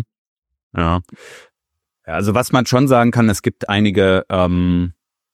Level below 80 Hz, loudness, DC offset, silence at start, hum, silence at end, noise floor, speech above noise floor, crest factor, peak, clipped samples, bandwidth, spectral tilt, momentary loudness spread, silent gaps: -40 dBFS; -16 LUFS; under 0.1%; 0 s; none; 0.4 s; -80 dBFS; 64 dB; 16 dB; -2 dBFS; under 0.1%; 15.5 kHz; -6 dB/octave; 11 LU; 0.18-0.42 s, 0.63-0.70 s